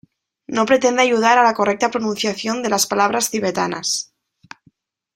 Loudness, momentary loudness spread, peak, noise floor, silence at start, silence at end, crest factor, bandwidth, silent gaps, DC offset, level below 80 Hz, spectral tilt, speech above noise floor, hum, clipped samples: -18 LUFS; 8 LU; -2 dBFS; -58 dBFS; 0.5 s; 1.1 s; 18 dB; 16 kHz; none; under 0.1%; -62 dBFS; -2.5 dB/octave; 41 dB; none; under 0.1%